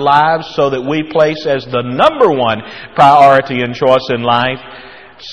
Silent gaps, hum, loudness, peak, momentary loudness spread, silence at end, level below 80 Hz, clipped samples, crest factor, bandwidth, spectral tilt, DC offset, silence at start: none; none; -12 LUFS; 0 dBFS; 11 LU; 0 s; -50 dBFS; 0.2%; 12 dB; 10.5 kHz; -6 dB/octave; 0.5%; 0 s